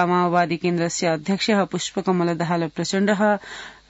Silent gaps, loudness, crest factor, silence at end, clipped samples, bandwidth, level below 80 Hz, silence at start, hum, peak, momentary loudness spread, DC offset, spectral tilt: none; -21 LUFS; 16 dB; 0.15 s; under 0.1%; 8 kHz; -60 dBFS; 0 s; none; -6 dBFS; 5 LU; under 0.1%; -5 dB/octave